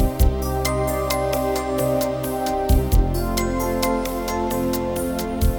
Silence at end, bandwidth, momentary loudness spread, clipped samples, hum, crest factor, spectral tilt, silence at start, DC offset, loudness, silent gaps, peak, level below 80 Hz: 0 s; 19.5 kHz; 4 LU; under 0.1%; none; 16 dB; -5.5 dB/octave; 0 s; 0.1%; -22 LUFS; none; -4 dBFS; -24 dBFS